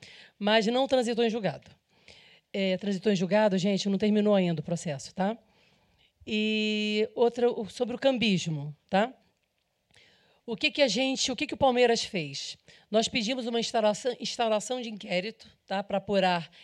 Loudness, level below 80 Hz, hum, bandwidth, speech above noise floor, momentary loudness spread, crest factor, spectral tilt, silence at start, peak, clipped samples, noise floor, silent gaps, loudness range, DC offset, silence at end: -28 LUFS; -66 dBFS; none; 11 kHz; 48 dB; 11 LU; 18 dB; -4.5 dB/octave; 0 s; -10 dBFS; under 0.1%; -76 dBFS; none; 2 LU; under 0.1%; 0.15 s